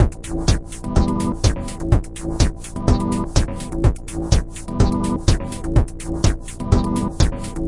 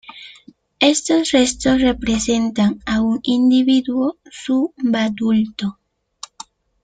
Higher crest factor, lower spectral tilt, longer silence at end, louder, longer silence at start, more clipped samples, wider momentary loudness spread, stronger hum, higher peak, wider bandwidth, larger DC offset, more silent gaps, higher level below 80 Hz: about the same, 18 dB vs 16 dB; first, -6 dB/octave vs -4 dB/octave; second, 0 s vs 1.1 s; second, -21 LUFS vs -17 LUFS; about the same, 0 s vs 0.1 s; neither; second, 5 LU vs 18 LU; neither; about the same, 0 dBFS vs -2 dBFS; first, 11.5 kHz vs 9.6 kHz; neither; neither; first, -22 dBFS vs -44 dBFS